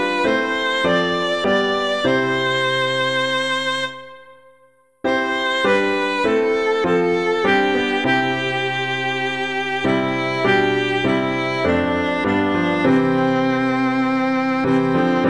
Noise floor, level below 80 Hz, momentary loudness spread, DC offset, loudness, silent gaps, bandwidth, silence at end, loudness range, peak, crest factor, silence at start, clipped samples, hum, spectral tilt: -55 dBFS; -52 dBFS; 4 LU; 0.4%; -18 LUFS; none; 11 kHz; 0 s; 3 LU; -4 dBFS; 14 dB; 0 s; under 0.1%; none; -5.5 dB/octave